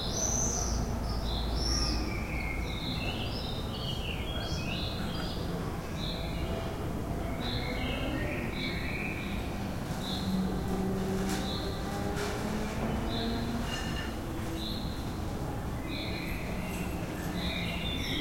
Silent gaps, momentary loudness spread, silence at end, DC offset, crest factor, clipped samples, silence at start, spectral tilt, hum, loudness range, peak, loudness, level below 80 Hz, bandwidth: none; 5 LU; 0 s; under 0.1%; 16 dB; under 0.1%; 0 s; -4.5 dB/octave; none; 2 LU; -18 dBFS; -34 LUFS; -40 dBFS; 16.5 kHz